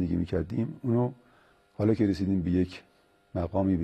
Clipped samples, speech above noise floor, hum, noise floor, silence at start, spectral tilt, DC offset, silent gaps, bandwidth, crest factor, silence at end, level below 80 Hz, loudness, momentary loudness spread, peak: under 0.1%; 34 dB; none; -62 dBFS; 0 s; -9.5 dB/octave; under 0.1%; none; 9 kHz; 16 dB; 0 s; -50 dBFS; -29 LUFS; 9 LU; -12 dBFS